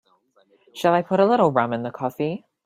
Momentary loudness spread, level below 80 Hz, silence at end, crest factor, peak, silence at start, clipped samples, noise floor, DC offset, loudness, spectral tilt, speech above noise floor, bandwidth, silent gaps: 11 LU; -66 dBFS; 0.3 s; 18 dB; -4 dBFS; 0.75 s; under 0.1%; -61 dBFS; under 0.1%; -21 LUFS; -7 dB/octave; 41 dB; 15.5 kHz; none